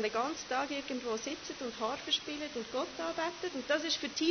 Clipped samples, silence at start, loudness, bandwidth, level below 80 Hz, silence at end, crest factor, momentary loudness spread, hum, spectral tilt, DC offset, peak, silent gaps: under 0.1%; 0 s; -36 LUFS; 6.6 kHz; -68 dBFS; 0 s; 18 dB; 7 LU; none; -2 dB/octave; under 0.1%; -18 dBFS; none